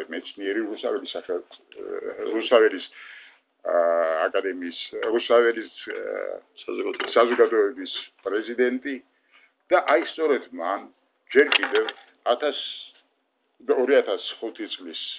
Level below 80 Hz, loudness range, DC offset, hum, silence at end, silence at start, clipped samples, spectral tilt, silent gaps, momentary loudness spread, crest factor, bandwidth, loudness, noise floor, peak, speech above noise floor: -78 dBFS; 3 LU; under 0.1%; none; 0 s; 0 s; under 0.1%; -6 dB/octave; none; 15 LU; 22 dB; 4 kHz; -24 LUFS; -72 dBFS; -2 dBFS; 47 dB